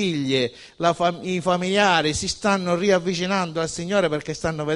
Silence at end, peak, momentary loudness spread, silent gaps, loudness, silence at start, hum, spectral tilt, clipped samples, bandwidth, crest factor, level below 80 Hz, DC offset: 0 s; -4 dBFS; 8 LU; none; -22 LUFS; 0 s; none; -4.5 dB/octave; under 0.1%; 11.5 kHz; 18 dB; -50 dBFS; under 0.1%